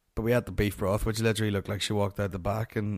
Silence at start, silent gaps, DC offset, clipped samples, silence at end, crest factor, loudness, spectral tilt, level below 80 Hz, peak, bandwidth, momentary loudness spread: 0.15 s; none; under 0.1%; under 0.1%; 0 s; 16 dB; -29 LUFS; -5.5 dB/octave; -42 dBFS; -12 dBFS; 15.5 kHz; 4 LU